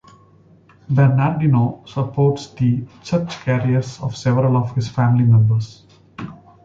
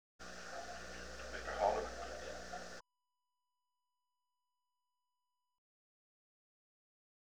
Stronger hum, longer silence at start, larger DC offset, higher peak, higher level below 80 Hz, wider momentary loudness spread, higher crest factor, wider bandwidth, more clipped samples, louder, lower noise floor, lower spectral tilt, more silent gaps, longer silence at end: neither; first, 0.9 s vs 0.2 s; neither; first, -4 dBFS vs -22 dBFS; first, -50 dBFS vs -62 dBFS; second, 12 LU vs 15 LU; second, 14 dB vs 26 dB; second, 7.6 kHz vs over 20 kHz; neither; first, -18 LUFS vs -44 LUFS; second, -50 dBFS vs under -90 dBFS; first, -8 dB/octave vs -3 dB/octave; neither; second, 0.3 s vs 1.8 s